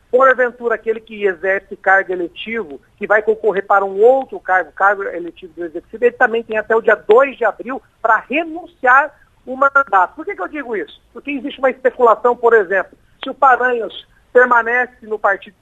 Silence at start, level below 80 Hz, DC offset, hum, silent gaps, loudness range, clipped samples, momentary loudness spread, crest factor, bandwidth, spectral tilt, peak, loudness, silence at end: 0.15 s; -56 dBFS; under 0.1%; none; none; 2 LU; under 0.1%; 16 LU; 16 dB; 7.8 kHz; -5.5 dB/octave; 0 dBFS; -15 LUFS; 0.15 s